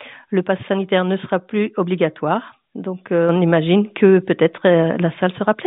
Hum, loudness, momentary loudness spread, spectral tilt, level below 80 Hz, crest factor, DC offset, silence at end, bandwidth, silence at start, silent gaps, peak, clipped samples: none; -18 LUFS; 9 LU; -6 dB/octave; -64 dBFS; 18 dB; under 0.1%; 0 s; 4 kHz; 0 s; none; 0 dBFS; under 0.1%